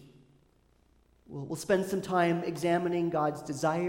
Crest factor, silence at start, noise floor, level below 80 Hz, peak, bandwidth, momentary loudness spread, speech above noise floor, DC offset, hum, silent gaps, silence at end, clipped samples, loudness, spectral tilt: 18 dB; 0 s; -66 dBFS; -66 dBFS; -14 dBFS; 16.5 kHz; 11 LU; 37 dB; under 0.1%; none; none; 0 s; under 0.1%; -30 LUFS; -6 dB/octave